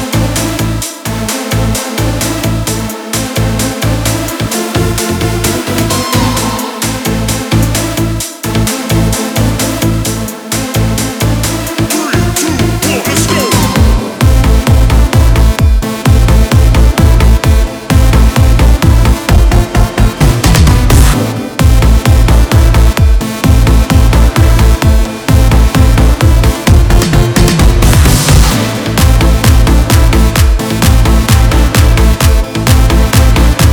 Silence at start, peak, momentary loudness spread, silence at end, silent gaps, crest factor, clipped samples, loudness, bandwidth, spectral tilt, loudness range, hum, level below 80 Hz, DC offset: 0 s; 0 dBFS; 6 LU; 0 s; none; 8 dB; 3%; -10 LUFS; over 20 kHz; -5 dB/octave; 5 LU; none; -10 dBFS; 0.2%